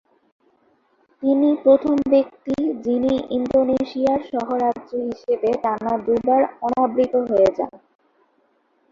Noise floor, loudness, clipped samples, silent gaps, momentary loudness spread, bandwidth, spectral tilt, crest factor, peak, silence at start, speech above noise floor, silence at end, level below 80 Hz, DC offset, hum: -64 dBFS; -20 LUFS; under 0.1%; none; 8 LU; 7.4 kHz; -7.5 dB/octave; 18 dB; -4 dBFS; 1.2 s; 44 dB; 1.15 s; -56 dBFS; under 0.1%; none